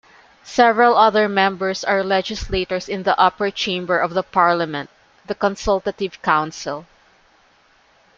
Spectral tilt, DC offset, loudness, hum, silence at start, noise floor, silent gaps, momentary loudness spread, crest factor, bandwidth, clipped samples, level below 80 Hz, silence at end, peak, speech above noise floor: -4.5 dB/octave; under 0.1%; -18 LUFS; none; 0.45 s; -56 dBFS; none; 12 LU; 18 dB; 7.6 kHz; under 0.1%; -44 dBFS; 1.35 s; -2 dBFS; 37 dB